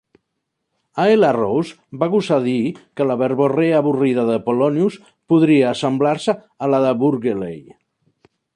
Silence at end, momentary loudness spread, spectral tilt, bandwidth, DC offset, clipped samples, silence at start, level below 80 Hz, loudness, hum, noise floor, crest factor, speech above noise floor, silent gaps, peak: 0.95 s; 9 LU; -7 dB/octave; 10.5 kHz; under 0.1%; under 0.1%; 0.95 s; -62 dBFS; -18 LUFS; none; -76 dBFS; 14 dB; 59 dB; none; -4 dBFS